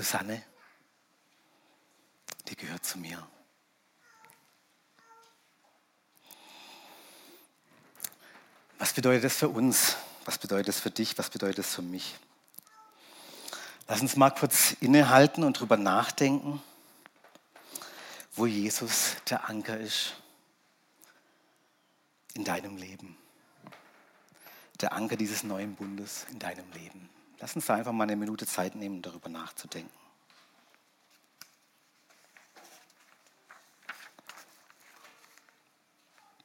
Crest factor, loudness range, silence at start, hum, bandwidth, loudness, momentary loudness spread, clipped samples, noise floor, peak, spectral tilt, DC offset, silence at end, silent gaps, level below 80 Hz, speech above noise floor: 26 dB; 18 LU; 0 s; none; 17 kHz; -29 LUFS; 26 LU; under 0.1%; -70 dBFS; -6 dBFS; -3.5 dB/octave; under 0.1%; 2 s; none; -84 dBFS; 41 dB